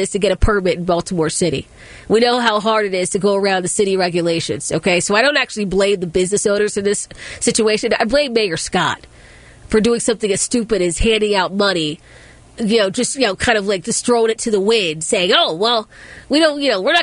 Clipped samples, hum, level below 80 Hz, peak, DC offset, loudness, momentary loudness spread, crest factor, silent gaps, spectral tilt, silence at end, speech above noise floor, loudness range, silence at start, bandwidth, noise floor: under 0.1%; none; -34 dBFS; 0 dBFS; under 0.1%; -16 LUFS; 6 LU; 16 dB; none; -3.5 dB/octave; 0 s; 25 dB; 2 LU; 0 s; 11 kHz; -41 dBFS